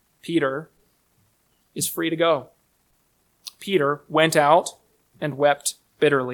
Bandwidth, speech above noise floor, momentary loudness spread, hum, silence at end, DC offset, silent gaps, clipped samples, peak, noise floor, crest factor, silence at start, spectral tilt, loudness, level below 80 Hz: 19 kHz; 45 dB; 17 LU; none; 0 s; under 0.1%; none; under 0.1%; -2 dBFS; -66 dBFS; 20 dB; 0.25 s; -4 dB/octave; -22 LUFS; -70 dBFS